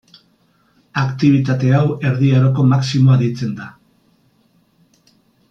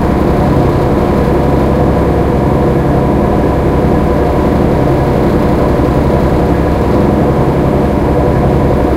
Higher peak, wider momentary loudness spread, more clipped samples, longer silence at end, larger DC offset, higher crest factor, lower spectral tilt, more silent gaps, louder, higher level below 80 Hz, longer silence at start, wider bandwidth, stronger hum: about the same, -2 dBFS vs 0 dBFS; first, 12 LU vs 1 LU; neither; first, 1.8 s vs 0 s; neither; about the same, 14 dB vs 10 dB; about the same, -8 dB/octave vs -8.5 dB/octave; neither; second, -15 LUFS vs -11 LUFS; second, -56 dBFS vs -18 dBFS; first, 0.95 s vs 0 s; second, 7.4 kHz vs 15.5 kHz; neither